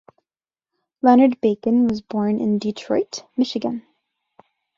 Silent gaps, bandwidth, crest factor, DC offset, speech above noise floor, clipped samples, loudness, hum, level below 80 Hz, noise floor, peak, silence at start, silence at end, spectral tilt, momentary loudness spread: none; 7.4 kHz; 18 dB; under 0.1%; over 71 dB; under 0.1%; -20 LUFS; none; -62 dBFS; under -90 dBFS; -2 dBFS; 1.05 s; 1 s; -6.5 dB/octave; 12 LU